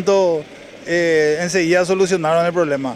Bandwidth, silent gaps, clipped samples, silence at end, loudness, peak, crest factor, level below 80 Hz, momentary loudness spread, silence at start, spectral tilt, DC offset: 13 kHz; none; under 0.1%; 0 s; -17 LUFS; -4 dBFS; 12 dB; -56 dBFS; 8 LU; 0 s; -4.5 dB/octave; under 0.1%